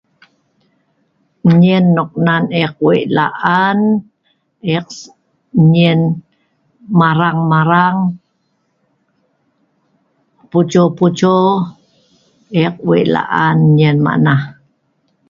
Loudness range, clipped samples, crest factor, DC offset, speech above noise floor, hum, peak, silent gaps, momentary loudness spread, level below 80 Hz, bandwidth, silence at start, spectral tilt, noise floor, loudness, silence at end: 4 LU; under 0.1%; 14 dB; under 0.1%; 52 dB; none; 0 dBFS; none; 9 LU; -54 dBFS; 7.2 kHz; 1.45 s; -7.5 dB/octave; -64 dBFS; -13 LUFS; 0.75 s